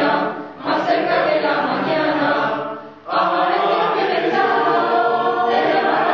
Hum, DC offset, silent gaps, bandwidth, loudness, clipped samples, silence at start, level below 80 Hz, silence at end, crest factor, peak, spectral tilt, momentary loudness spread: none; 0.1%; none; 6.8 kHz; -18 LUFS; under 0.1%; 0 s; -70 dBFS; 0 s; 12 dB; -4 dBFS; -6 dB/octave; 6 LU